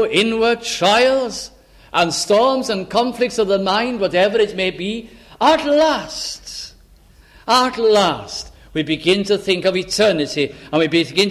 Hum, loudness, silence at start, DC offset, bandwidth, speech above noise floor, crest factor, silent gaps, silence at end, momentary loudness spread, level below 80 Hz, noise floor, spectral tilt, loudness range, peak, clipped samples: none; -17 LUFS; 0 s; under 0.1%; 15 kHz; 31 dB; 16 dB; none; 0 s; 12 LU; -48 dBFS; -48 dBFS; -3.5 dB/octave; 2 LU; 0 dBFS; under 0.1%